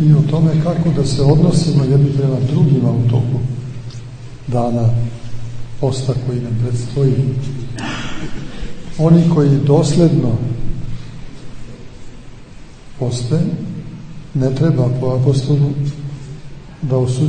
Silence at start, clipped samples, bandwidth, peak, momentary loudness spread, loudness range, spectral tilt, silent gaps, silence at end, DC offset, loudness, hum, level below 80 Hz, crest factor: 0 s; under 0.1%; 9.4 kHz; 0 dBFS; 19 LU; 8 LU; -8 dB/octave; none; 0 s; under 0.1%; -16 LUFS; none; -34 dBFS; 16 dB